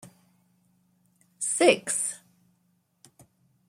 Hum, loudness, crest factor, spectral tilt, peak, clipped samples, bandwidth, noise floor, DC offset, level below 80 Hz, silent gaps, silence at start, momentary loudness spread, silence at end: none; -24 LUFS; 26 dB; -1.5 dB/octave; -6 dBFS; under 0.1%; 15.5 kHz; -70 dBFS; under 0.1%; -82 dBFS; none; 0.05 s; 11 LU; 1.5 s